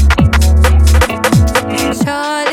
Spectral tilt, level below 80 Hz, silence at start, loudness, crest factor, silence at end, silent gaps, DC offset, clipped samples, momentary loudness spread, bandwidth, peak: -5.5 dB/octave; -12 dBFS; 0 s; -11 LUFS; 10 dB; 0 s; none; under 0.1%; under 0.1%; 6 LU; 15.5 kHz; 0 dBFS